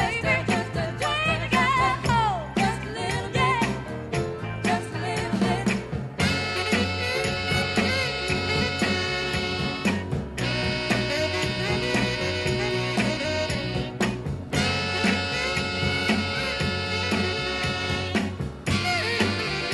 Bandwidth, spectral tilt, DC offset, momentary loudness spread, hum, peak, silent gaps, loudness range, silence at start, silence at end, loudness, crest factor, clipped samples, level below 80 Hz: 12 kHz; -4.5 dB/octave; under 0.1%; 6 LU; none; -8 dBFS; none; 2 LU; 0 s; 0 s; -25 LUFS; 16 dB; under 0.1%; -42 dBFS